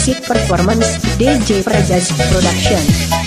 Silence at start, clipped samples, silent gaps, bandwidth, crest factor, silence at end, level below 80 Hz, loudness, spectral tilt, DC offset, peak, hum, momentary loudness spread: 0 s; under 0.1%; none; 15.5 kHz; 12 dB; 0 s; -24 dBFS; -13 LUFS; -4.5 dB/octave; under 0.1%; 0 dBFS; none; 2 LU